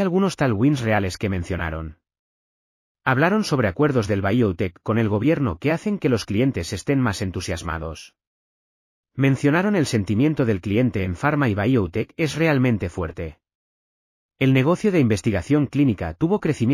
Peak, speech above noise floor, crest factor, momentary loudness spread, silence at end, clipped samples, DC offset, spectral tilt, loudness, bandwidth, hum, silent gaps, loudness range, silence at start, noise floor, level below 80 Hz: -4 dBFS; over 69 dB; 16 dB; 9 LU; 0 s; under 0.1%; under 0.1%; -7 dB/octave; -21 LUFS; 15 kHz; none; 2.19-2.95 s, 8.27-9.03 s, 13.55-14.29 s; 3 LU; 0 s; under -90 dBFS; -44 dBFS